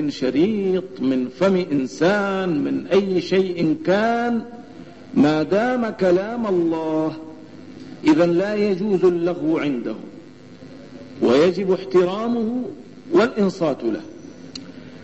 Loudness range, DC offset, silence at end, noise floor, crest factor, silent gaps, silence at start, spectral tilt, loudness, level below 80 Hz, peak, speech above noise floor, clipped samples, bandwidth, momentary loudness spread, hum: 2 LU; 0.3%; 0 s; -42 dBFS; 14 dB; none; 0 s; -7 dB/octave; -20 LUFS; -58 dBFS; -6 dBFS; 22 dB; under 0.1%; 8.2 kHz; 21 LU; none